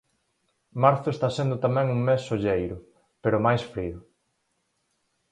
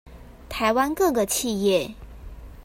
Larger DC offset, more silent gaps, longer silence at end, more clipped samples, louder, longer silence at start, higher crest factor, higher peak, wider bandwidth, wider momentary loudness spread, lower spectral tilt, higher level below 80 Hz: neither; neither; first, 1.3 s vs 0 s; neither; about the same, -25 LUFS vs -23 LUFS; first, 0.75 s vs 0.05 s; first, 22 dB vs 16 dB; first, -4 dBFS vs -8 dBFS; second, 9.4 kHz vs 16.5 kHz; second, 13 LU vs 22 LU; first, -7.5 dB/octave vs -3.5 dB/octave; second, -52 dBFS vs -44 dBFS